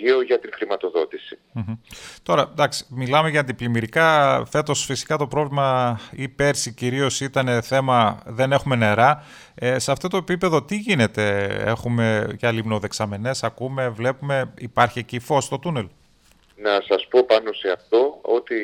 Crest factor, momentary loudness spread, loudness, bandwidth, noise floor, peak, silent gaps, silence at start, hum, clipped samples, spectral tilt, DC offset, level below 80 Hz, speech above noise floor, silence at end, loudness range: 18 dB; 10 LU; -21 LUFS; 16.5 kHz; -56 dBFS; -2 dBFS; none; 0 s; none; under 0.1%; -5 dB/octave; under 0.1%; -54 dBFS; 35 dB; 0 s; 4 LU